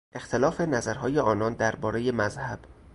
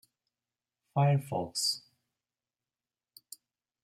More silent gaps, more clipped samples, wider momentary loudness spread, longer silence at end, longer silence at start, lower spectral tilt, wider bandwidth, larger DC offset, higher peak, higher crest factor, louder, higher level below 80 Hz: neither; neither; second, 9 LU vs 23 LU; second, 0.2 s vs 2.05 s; second, 0.15 s vs 0.95 s; about the same, -6 dB/octave vs -5 dB/octave; second, 11.5 kHz vs 15.5 kHz; neither; first, -8 dBFS vs -16 dBFS; about the same, 18 dB vs 20 dB; first, -27 LUFS vs -31 LUFS; first, -52 dBFS vs -76 dBFS